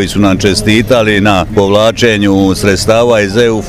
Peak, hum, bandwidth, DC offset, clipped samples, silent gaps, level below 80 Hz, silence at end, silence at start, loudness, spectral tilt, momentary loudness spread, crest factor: 0 dBFS; none; 16 kHz; 0.4%; 0.3%; none; -28 dBFS; 0 s; 0 s; -9 LUFS; -5 dB/octave; 2 LU; 8 dB